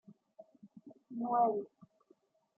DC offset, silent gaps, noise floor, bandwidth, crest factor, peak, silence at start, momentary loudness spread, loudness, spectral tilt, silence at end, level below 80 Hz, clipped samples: under 0.1%; none; -71 dBFS; 2.4 kHz; 20 dB; -20 dBFS; 0.1 s; 26 LU; -34 LUFS; -10.5 dB/octave; 0.95 s; under -90 dBFS; under 0.1%